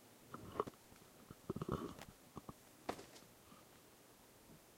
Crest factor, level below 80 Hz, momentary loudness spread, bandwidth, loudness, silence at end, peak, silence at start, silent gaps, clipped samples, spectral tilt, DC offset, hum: 28 dB; -68 dBFS; 18 LU; 16 kHz; -50 LUFS; 0 s; -22 dBFS; 0 s; none; under 0.1%; -5.5 dB/octave; under 0.1%; none